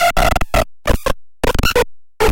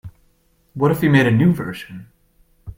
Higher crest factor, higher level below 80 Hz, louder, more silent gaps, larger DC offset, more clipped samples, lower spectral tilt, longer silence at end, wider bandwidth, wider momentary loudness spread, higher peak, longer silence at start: about the same, 16 dB vs 20 dB; first, -22 dBFS vs -48 dBFS; about the same, -18 LUFS vs -17 LUFS; neither; neither; neither; second, -4 dB/octave vs -7.5 dB/octave; about the same, 0 s vs 0.05 s; about the same, 17 kHz vs 16.5 kHz; second, 6 LU vs 23 LU; about the same, 0 dBFS vs 0 dBFS; about the same, 0 s vs 0.05 s